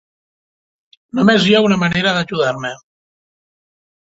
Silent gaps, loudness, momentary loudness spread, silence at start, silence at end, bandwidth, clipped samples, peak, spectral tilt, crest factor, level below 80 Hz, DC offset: none; -15 LUFS; 13 LU; 1.15 s; 1.4 s; 8 kHz; under 0.1%; -2 dBFS; -5.5 dB/octave; 16 dB; -52 dBFS; under 0.1%